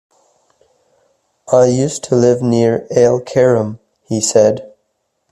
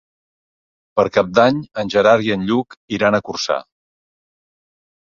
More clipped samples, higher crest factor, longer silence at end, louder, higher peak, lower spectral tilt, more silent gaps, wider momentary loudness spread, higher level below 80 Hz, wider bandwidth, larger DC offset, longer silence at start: neither; about the same, 14 dB vs 18 dB; second, 0.65 s vs 1.4 s; first, -14 LUFS vs -17 LUFS; about the same, 0 dBFS vs -2 dBFS; about the same, -5.5 dB/octave vs -5.5 dB/octave; second, none vs 2.77-2.88 s; second, 6 LU vs 9 LU; about the same, -54 dBFS vs -54 dBFS; first, 12.5 kHz vs 7.4 kHz; neither; first, 1.5 s vs 0.95 s